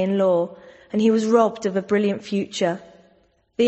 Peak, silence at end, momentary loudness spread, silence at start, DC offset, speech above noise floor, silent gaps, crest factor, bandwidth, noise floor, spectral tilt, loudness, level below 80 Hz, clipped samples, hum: -4 dBFS; 0 s; 11 LU; 0 s; under 0.1%; 40 dB; none; 18 dB; 8.2 kHz; -60 dBFS; -6 dB/octave; -21 LUFS; -66 dBFS; under 0.1%; none